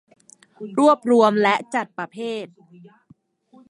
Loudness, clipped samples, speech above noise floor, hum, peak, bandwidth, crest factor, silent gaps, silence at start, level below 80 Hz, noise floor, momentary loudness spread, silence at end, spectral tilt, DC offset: -20 LUFS; under 0.1%; 36 dB; none; -2 dBFS; 11.5 kHz; 20 dB; none; 0.6 s; -74 dBFS; -56 dBFS; 17 LU; 1.25 s; -5 dB/octave; under 0.1%